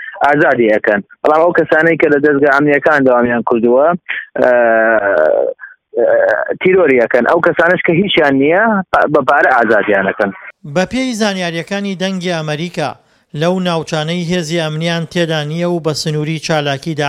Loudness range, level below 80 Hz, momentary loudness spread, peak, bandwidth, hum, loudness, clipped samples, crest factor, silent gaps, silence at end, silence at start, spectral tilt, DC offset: 7 LU; -52 dBFS; 8 LU; 0 dBFS; 13.5 kHz; none; -13 LUFS; under 0.1%; 12 dB; none; 0 s; 0 s; -5.5 dB/octave; under 0.1%